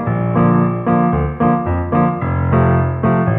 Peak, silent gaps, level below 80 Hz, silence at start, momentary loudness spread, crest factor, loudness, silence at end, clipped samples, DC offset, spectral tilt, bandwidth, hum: -2 dBFS; none; -32 dBFS; 0 s; 3 LU; 12 dB; -15 LUFS; 0 s; under 0.1%; under 0.1%; -13 dB/octave; 3.7 kHz; none